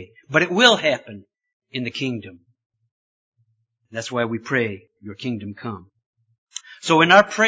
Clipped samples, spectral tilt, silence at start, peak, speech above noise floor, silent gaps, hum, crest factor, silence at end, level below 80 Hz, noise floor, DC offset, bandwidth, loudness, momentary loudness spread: under 0.1%; -4 dB/octave; 0 s; 0 dBFS; 48 dB; 1.53-1.60 s, 2.66-2.70 s, 2.91-3.32 s, 6.06-6.13 s, 6.38-6.47 s; none; 22 dB; 0 s; -62 dBFS; -68 dBFS; under 0.1%; 8 kHz; -19 LUFS; 23 LU